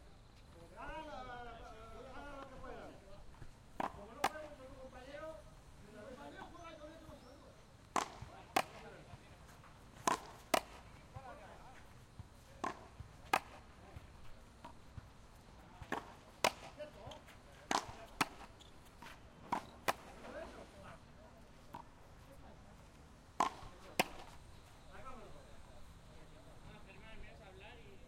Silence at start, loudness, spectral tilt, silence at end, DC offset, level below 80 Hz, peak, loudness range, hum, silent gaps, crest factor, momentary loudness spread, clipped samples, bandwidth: 0 s; -44 LUFS; -3 dB/octave; 0 s; under 0.1%; -62 dBFS; -10 dBFS; 9 LU; none; none; 36 dB; 21 LU; under 0.1%; 16 kHz